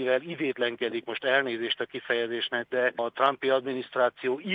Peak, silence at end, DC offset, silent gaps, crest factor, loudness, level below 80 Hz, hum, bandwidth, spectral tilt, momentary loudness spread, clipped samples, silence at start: -8 dBFS; 0 s; under 0.1%; none; 20 dB; -28 LUFS; -80 dBFS; none; 5 kHz; -6 dB/octave; 6 LU; under 0.1%; 0 s